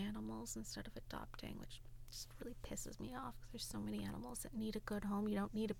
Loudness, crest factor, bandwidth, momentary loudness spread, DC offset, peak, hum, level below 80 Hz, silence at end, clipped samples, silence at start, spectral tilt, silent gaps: -47 LUFS; 18 dB; 18 kHz; 11 LU; under 0.1%; -28 dBFS; none; -56 dBFS; 0 s; under 0.1%; 0 s; -4.5 dB/octave; none